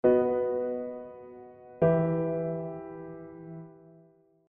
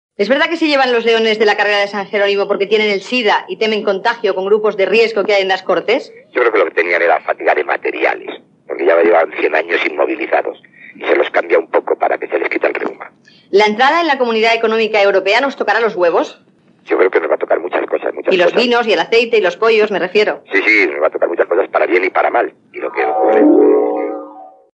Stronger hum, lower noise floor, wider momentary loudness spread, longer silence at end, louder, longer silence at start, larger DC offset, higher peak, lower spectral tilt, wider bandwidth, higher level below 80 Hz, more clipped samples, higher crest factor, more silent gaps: neither; first, -61 dBFS vs -35 dBFS; first, 22 LU vs 7 LU; first, 0.8 s vs 0.3 s; second, -29 LUFS vs -14 LUFS; second, 0.05 s vs 0.2 s; neither; second, -10 dBFS vs 0 dBFS; first, -9.5 dB/octave vs -4 dB/octave; second, 3.4 kHz vs 8.2 kHz; first, -62 dBFS vs -80 dBFS; neither; first, 20 dB vs 14 dB; neither